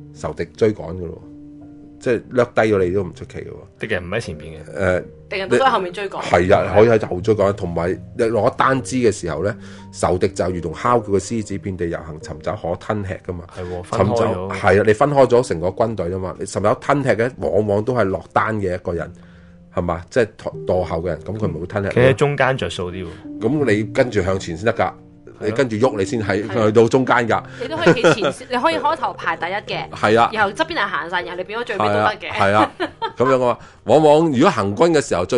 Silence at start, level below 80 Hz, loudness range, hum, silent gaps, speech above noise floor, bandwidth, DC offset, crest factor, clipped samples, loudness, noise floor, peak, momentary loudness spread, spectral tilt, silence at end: 0 s; -42 dBFS; 5 LU; none; none; 21 dB; 11.5 kHz; under 0.1%; 18 dB; under 0.1%; -19 LUFS; -40 dBFS; 0 dBFS; 13 LU; -6 dB/octave; 0 s